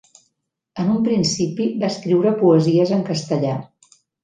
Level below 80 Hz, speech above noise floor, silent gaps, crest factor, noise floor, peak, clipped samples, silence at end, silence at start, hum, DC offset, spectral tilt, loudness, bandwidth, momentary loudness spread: -60 dBFS; 55 dB; none; 16 dB; -73 dBFS; -2 dBFS; under 0.1%; 0.6 s; 0.75 s; none; under 0.1%; -6.5 dB/octave; -19 LUFS; 9.4 kHz; 9 LU